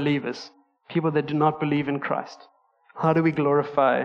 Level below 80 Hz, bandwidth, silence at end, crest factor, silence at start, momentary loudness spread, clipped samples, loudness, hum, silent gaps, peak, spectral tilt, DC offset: -68 dBFS; 7 kHz; 0 s; 18 dB; 0 s; 12 LU; under 0.1%; -24 LUFS; none; none; -6 dBFS; -8 dB/octave; under 0.1%